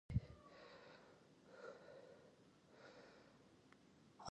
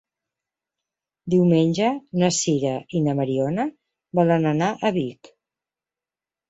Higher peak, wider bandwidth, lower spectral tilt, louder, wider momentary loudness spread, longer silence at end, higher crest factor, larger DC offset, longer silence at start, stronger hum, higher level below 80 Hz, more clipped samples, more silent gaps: second, -28 dBFS vs -6 dBFS; first, 9.6 kHz vs 8 kHz; about the same, -6.5 dB/octave vs -6 dB/octave; second, -58 LUFS vs -22 LUFS; first, 12 LU vs 9 LU; second, 0 s vs 1.35 s; first, 28 dB vs 18 dB; neither; second, 0.1 s vs 1.25 s; neither; about the same, -64 dBFS vs -62 dBFS; neither; neither